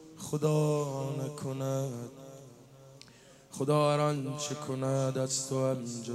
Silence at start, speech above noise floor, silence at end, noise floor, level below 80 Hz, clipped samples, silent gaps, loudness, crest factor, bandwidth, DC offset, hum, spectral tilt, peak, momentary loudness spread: 0 s; 25 dB; 0 s; -56 dBFS; -72 dBFS; under 0.1%; none; -32 LUFS; 16 dB; 14.5 kHz; under 0.1%; none; -5.5 dB/octave; -16 dBFS; 15 LU